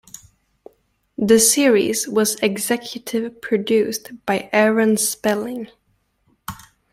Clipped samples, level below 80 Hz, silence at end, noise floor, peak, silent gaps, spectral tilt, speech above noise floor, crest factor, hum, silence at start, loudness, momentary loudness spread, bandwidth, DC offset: under 0.1%; -58 dBFS; 0.35 s; -64 dBFS; -2 dBFS; none; -3 dB/octave; 46 dB; 18 dB; none; 1.2 s; -18 LUFS; 21 LU; 16.5 kHz; under 0.1%